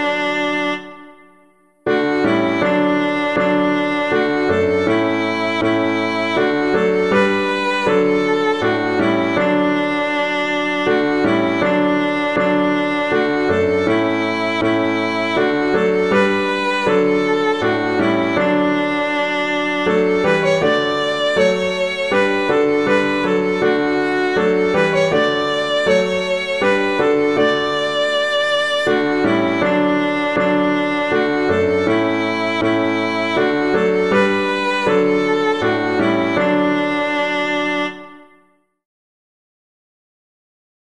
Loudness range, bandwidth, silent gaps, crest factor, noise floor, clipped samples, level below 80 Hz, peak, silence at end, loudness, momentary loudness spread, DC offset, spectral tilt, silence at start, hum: 1 LU; 11 kHz; none; 14 dB; -57 dBFS; under 0.1%; -52 dBFS; -2 dBFS; 2.65 s; -17 LUFS; 3 LU; 0.4%; -5.5 dB/octave; 0 s; none